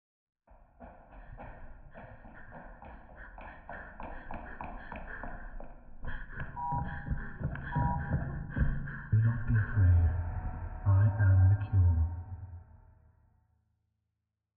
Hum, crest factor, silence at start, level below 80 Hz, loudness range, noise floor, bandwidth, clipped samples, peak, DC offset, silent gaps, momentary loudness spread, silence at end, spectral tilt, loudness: none; 16 dB; 0.5 s; -42 dBFS; 21 LU; -86 dBFS; 3.4 kHz; under 0.1%; -18 dBFS; under 0.1%; none; 25 LU; 1.8 s; -9 dB/octave; -31 LUFS